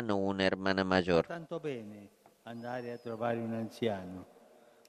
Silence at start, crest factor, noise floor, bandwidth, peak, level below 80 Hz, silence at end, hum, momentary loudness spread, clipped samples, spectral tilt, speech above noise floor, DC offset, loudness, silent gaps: 0 s; 22 dB; -61 dBFS; 13.5 kHz; -12 dBFS; -66 dBFS; 0.65 s; none; 19 LU; under 0.1%; -6.5 dB/octave; 27 dB; under 0.1%; -34 LUFS; none